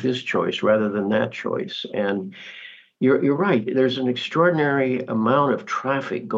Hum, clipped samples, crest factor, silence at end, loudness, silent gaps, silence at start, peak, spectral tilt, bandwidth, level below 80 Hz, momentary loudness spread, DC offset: none; under 0.1%; 16 dB; 0 s; -22 LUFS; none; 0 s; -6 dBFS; -6.5 dB/octave; 7.6 kHz; -74 dBFS; 9 LU; under 0.1%